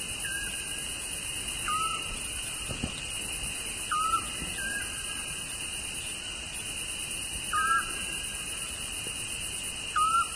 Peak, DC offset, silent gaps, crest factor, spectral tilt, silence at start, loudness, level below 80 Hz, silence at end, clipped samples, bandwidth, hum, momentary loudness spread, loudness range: -14 dBFS; under 0.1%; none; 18 dB; -0.5 dB/octave; 0 s; -31 LUFS; -48 dBFS; 0 s; under 0.1%; 11 kHz; none; 6 LU; 1 LU